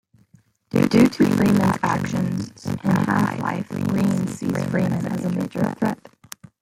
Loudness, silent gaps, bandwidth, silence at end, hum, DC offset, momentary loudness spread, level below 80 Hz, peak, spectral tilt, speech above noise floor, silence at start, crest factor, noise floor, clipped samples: -21 LUFS; none; 16 kHz; 0.65 s; none; under 0.1%; 10 LU; -54 dBFS; -4 dBFS; -7 dB/octave; 36 dB; 0.75 s; 18 dB; -57 dBFS; under 0.1%